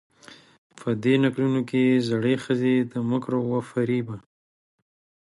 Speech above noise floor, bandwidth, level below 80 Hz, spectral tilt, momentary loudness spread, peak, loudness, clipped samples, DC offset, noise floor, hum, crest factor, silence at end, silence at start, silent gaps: over 67 dB; 11.5 kHz; -66 dBFS; -7.5 dB/octave; 8 LU; -10 dBFS; -24 LUFS; under 0.1%; under 0.1%; under -90 dBFS; none; 16 dB; 1.05 s; 0.3 s; 0.58-0.70 s